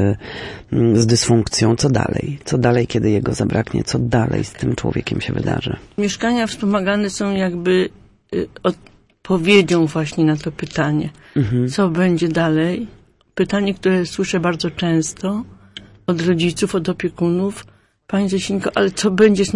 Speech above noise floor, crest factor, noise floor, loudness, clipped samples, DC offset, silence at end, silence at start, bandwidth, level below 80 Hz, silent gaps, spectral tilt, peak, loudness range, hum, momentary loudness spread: 23 dB; 16 dB; -41 dBFS; -18 LUFS; under 0.1%; under 0.1%; 0 s; 0 s; 11.5 kHz; -44 dBFS; none; -5.5 dB/octave; -2 dBFS; 3 LU; none; 10 LU